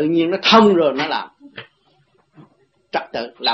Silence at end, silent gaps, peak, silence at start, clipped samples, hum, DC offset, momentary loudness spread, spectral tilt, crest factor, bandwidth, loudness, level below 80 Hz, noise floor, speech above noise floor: 0 s; none; 0 dBFS; 0 s; under 0.1%; none; under 0.1%; 26 LU; -5 dB/octave; 18 dB; 8.2 kHz; -16 LUFS; -62 dBFS; -60 dBFS; 43 dB